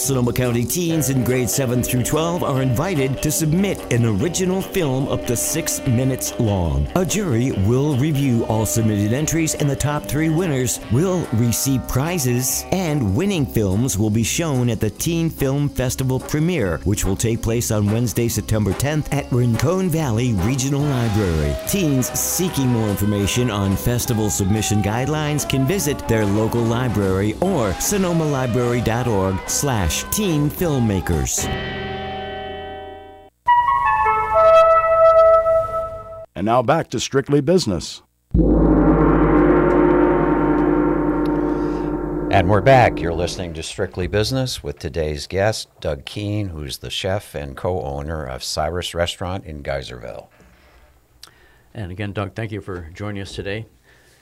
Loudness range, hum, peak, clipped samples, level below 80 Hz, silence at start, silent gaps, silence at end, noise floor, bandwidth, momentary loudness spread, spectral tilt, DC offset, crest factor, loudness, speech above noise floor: 9 LU; none; -4 dBFS; under 0.1%; -34 dBFS; 0 s; none; 0.55 s; -51 dBFS; 16.5 kHz; 12 LU; -5.5 dB/octave; under 0.1%; 14 dB; -19 LUFS; 32 dB